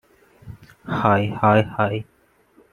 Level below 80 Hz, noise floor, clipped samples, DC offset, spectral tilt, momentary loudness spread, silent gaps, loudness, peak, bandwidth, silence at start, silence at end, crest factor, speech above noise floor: -54 dBFS; -57 dBFS; under 0.1%; under 0.1%; -8.5 dB/octave; 13 LU; none; -20 LUFS; -2 dBFS; 9.8 kHz; 0.45 s; 0.7 s; 20 dB; 38 dB